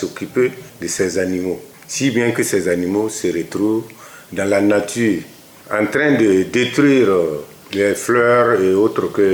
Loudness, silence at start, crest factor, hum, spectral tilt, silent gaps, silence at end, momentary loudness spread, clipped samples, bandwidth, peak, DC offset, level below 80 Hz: -17 LUFS; 0 s; 12 dB; none; -5 dB/octave; none; 0 s; 11 LU; under 0.1%; over 20 kHz; -4 dBFS; under 0.1%; -60 dBFS